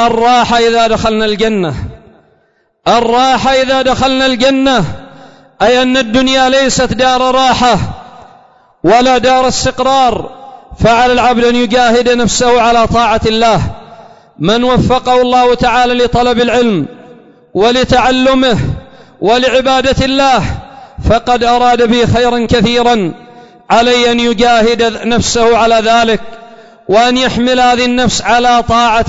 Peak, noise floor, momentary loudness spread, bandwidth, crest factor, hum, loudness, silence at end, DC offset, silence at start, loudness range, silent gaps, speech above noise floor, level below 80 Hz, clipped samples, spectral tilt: 0 dBFS; -55 dBFS; 7 LU; 8 kHz; 10 dB; none; -9 LUFS; 0 s; under 0.1%; 0 s; 2 LU; none; 46 dB; -30 dBFS; under 0.1%; -4.5 dB/octave